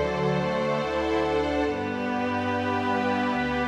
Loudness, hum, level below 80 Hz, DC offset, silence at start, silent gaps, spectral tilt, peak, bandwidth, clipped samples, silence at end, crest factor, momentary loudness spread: -26 LUFS; none; -46 dBFS; under 0.1%; 0 s; none; -6.5 dB/octave; -14 dBFS; 11.5 kHz; under 0.1%; 0 s; 12 dB; 2 LU